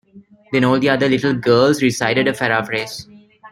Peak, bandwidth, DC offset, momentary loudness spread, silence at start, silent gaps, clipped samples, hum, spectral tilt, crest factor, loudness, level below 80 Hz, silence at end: -2 dBFS; 16 kHz; under 0.1%; 9 LU; 0.15 s; none; under 0.1%; none; -5 dB/octave; 16 dB; -16 LUFS; -54 dBFS; 0.05 s